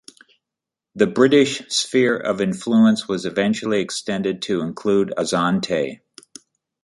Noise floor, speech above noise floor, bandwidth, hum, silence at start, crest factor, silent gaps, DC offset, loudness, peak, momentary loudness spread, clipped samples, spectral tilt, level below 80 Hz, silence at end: -86 dBFS; 67 dB; 11.5 kHz; none; 0.95 s; 18 dB; none; under 0.1%; -19 LUFS; -2 dBFS; 8 LU; under 0.1%; -4.5 dB/octave; -60 dBFS; 0.9 s